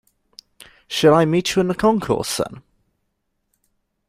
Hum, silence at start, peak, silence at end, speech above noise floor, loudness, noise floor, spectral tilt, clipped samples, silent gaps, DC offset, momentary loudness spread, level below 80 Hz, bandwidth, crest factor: none; 0.9 s; -2 dBFS; 1.5 s; 55 dB; -18 LUFS; -73 dBFS; -5 dB/octave; under 0.1%; none; under 0.1%; 11 LU; -52 dBFS; 16 kHz; 20 dB